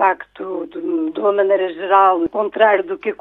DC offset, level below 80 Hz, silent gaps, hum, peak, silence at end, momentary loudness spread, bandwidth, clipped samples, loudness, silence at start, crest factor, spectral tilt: under 0.1%; -60 dBFS; none; 50 Hz at -65 dBFS; 0 dBFS; 0.05 s; 13 LU; 4.1 kHz; under 0.1%; -17 LUFS; 0 s; 16 dB; -7.5 dB/octave